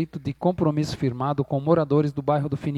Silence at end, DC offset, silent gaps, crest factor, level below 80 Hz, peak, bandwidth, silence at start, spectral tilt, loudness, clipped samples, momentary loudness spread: 0 s; under 0.1%; none; 18 dB; -52 dBFS; -6 dBFS; 11 kHz; 0 s; -8 dB/octave; -24 LUFS; under 0.1%; 6 LU